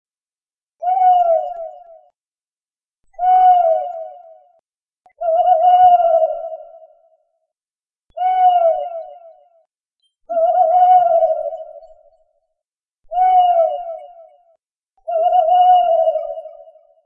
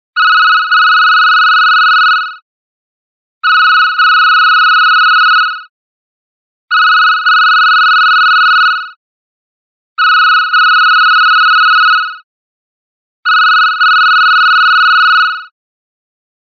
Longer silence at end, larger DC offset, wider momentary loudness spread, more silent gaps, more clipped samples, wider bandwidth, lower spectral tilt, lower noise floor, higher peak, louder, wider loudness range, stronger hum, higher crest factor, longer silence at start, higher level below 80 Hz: second, 0.6 s vs 1.05 s; neither; first, 20 LU vs 6 LU; second, 2.28-2.32 s vs 2.42-3.41 s, 5.69-6.68 s, 8.96-9.96 s, 12.24-13.23 s; neither; second, 3.2 kHz vs 6.2 kHz; first, -4 dB/octave vs 7 dB/octave; about the same, under -90 dBFS vs under -90 dBFS; about the same, -2 dBFS vs 0 dBFS; second, -14 LUFS vs -6 LUFS; first, 5 LU vs 1 LU; neither; first, 14 dB vs 8 dB; first, 0.8 s vs 0.15 s; first, -62 dBFS vs -88 dBFS